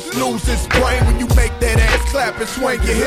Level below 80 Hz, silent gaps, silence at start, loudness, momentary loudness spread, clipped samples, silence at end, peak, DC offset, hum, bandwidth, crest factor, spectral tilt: -18 dBFS; none; 0 s; -16 LUFS; 5 LU; under 0.1%; 0 s; -2 dBFS; under 0.1%; none; 15.5 kHz; 14 dB; -4.5 dB/octave